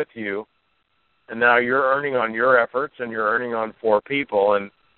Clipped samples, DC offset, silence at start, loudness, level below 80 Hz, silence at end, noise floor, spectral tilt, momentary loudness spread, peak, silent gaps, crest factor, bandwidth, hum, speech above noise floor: under 0.1%; under 0.1%; 0 s; -20 LUFS; -64 dBFS; 0.3 s; -68 dBFS; -2.5 dB/octave; 10 LU; -2 dBFS; none; 20 dB; 4.3 kHz; none; 47 dB